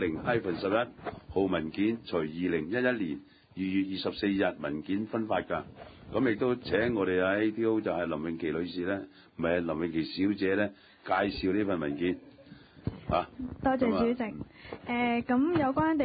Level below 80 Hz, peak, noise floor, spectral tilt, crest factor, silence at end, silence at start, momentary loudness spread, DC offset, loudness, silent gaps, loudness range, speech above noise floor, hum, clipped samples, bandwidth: -54 dBFS; -14 dBFS; -53 dBFS; -10 dB/octave; 16 dB; 0 s; 0 s; 10 LU; under 0.1%; -31 LUFS; none; 2 LU; 23 dB; none; under 0.1%; 5 kHz